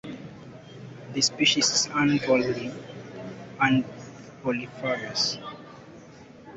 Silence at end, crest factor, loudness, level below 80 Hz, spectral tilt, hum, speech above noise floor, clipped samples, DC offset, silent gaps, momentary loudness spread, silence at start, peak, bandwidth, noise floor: 0 s; 20 dB; -24 LUFS; -62 dBFS; -3 dB/octave; none; 23 dB; under 0.1%; under 0.1%; none; 23 LU; 0.05 s; -8 dBFS; 8.4 kHz; -48 dBFS